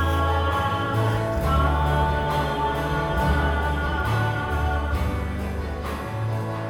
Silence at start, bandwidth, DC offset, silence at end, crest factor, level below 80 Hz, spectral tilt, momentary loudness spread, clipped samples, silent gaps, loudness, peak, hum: 0 s; 16.5 kHz; under 0.1%; 0 s; 14 dB; -28 dBFS; -6.5 dB/octave; 7 LU; under 0.1%; none; -24 LUFS; -10 dBFS; none